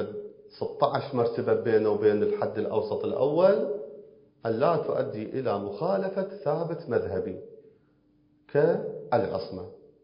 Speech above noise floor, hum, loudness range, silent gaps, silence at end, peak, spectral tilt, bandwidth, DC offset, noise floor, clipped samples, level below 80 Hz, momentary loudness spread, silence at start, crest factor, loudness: 38 dB; none; 5 LU; none; 0.25 s; -8 dBFS; -11 dB/octave; 5.4 kHz; under 0.1%; -64 dBFS; under 0.1%; -62 dBFS; 14 LU; 0 s; 20 dB; -27 LUFS